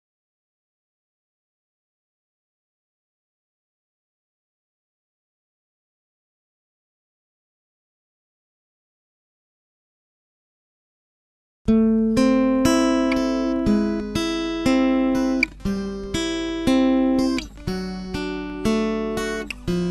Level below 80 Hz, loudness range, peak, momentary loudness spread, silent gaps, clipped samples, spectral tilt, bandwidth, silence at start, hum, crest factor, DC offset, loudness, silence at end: -42 dBFS; 4 LU; -4 dBFS; 10 LU; none; under 0.1%; -5.5 dB/octave; 13.5 kHz; 11.65 s; none; 22 dB; under 0.1%; -21 LUFS; 0 s